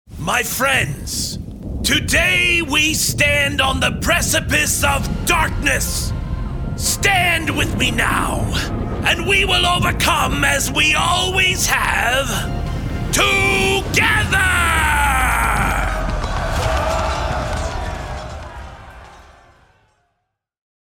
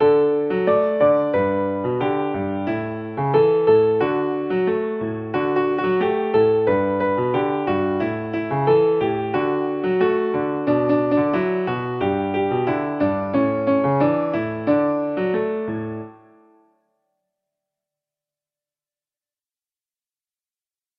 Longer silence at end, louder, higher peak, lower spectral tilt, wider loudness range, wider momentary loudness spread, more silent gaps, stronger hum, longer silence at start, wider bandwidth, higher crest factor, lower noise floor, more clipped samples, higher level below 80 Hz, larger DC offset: second, 1.6 s vs 4.85 s; first, -16 LUFS vs -20 LUFS; about the same, -2 dBFS vs -4 dBFS; second, -3 dB/octave vs -10 dB/octave; first, 8 LU vs 5 LU; first, 10 LU vs 7 LU; neither; neither; about the same, 0.1 s vs 0 s; first, over 20 kHz vs 5.2 kHz; about the same, 16 dB vs 16 dB; second, -73 dBFS vs under -90 dBFS; neither; first, -26 dBFS vs -58 dBFS; neither